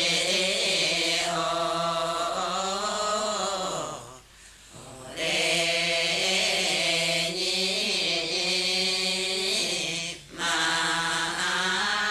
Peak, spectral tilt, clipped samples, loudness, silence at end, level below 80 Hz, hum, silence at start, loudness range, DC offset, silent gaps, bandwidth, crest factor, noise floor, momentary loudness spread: -12 dBFS; -1 dB/octave; under 0.1%; -24 LUFS; 0 s; -60 dBFS; none; 0 s; 5 LU; under 0.1%; none; 15 kHz; 14 dB; -51 dBFS; 7 LU